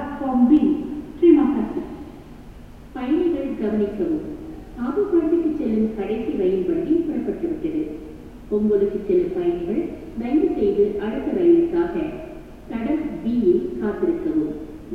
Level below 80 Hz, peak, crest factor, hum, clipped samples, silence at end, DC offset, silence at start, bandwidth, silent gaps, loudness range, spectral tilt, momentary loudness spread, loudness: -44 dBFS; -4 dBFS; 18 dB; none; under 0.1%; 0 s; 0.2%; 0 s; 4.7 kHz; none; 3 LU; -9 dB/octave; 17 LU; -21 LUFS